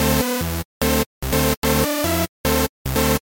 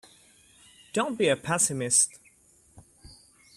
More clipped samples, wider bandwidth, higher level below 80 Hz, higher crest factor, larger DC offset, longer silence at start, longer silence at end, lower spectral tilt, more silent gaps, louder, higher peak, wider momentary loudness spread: neither; about the same, 17 kHz vs 15.5 kHz; first, -30 dBFS vs -64 dBFS; second, 16 dB vs 22 dB; neither; second, 0 s vs 0.95 s; second, 0.05 s vs 0.45 s; first, -4 dB/octave vs -2.5 dB/octave; first, 0.65-0.81 s, 1.06-1.21 s, 1.57-1.62 s, 2.29-2.44 s, 2.69-2.85 s vs none; first, -20 LUFS vs -25 LUFS; first, -4 dBFS vs -8 dBFS; second, 4 LU vs 8 LU